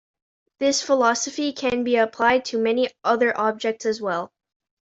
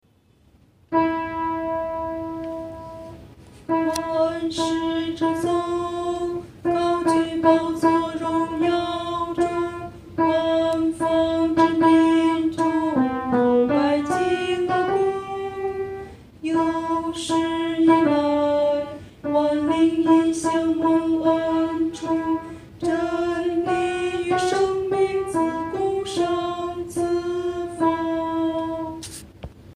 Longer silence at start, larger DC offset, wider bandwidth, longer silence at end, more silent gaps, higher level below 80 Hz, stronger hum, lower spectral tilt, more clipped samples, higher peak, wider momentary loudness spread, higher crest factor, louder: second, 0.6 s vs 0.9 s; neither; second, 8.2 kHz vs 12 kHz; first, 0.6 s vs 0 s; neither; second, -62 dBFS vs -52 dBFS; neither; second, -2.5 dB/octave vs -5.5 dB/octave; neither; about the same, -4 dBFS vs -4 dBFS; second, 7 LU vs 11 LU; about the same, 18 dB vs 16 dB; about the same, -22 LUFS vs -22 LUFS